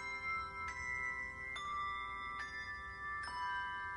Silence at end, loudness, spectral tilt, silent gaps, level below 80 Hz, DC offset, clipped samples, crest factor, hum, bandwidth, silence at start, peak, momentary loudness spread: 0 s; -42 LUFS; -2.5 dB/octave; none; -62 dBFS; under 0.1%; under 0.1%; 12 dB; none; 10.5 kHz; 0 s; -30 dBFS; 4 LU